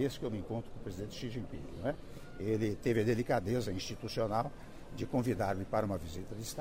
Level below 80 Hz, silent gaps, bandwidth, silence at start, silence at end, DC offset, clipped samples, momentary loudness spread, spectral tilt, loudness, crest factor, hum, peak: -52 dBFS; none; 16 kHz; 0 s; 0 s; under 0.1%; under 0.1%; 12 LU; -6 dB/octave; -37 LUFS; 18 dB; none; -18 dBFS